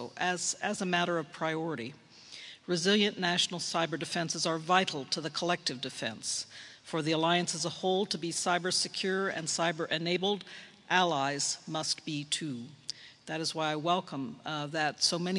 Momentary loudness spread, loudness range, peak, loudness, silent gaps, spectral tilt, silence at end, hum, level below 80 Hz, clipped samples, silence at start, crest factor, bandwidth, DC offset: 12 LU; 3 LU; -10 dBFS; -31 LUFS; none; -3 dB/octave; 0 s; none; -78 dBFS; under 0.1%; 0 s; 22 dB; 11.5 kHz; under 0.1%